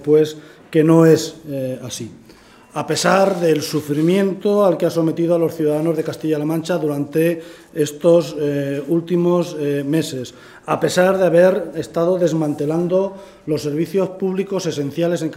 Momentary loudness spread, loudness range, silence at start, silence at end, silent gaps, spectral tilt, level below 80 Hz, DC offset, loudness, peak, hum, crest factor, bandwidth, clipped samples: 12 LU; 2 LU; 0 s; 0 s; none; -6 dB/octave; -60 dBFS; under 0.1%; -18 LUFS; 0 dBFS; none; 18 dB; 16 kHz; under 0.1%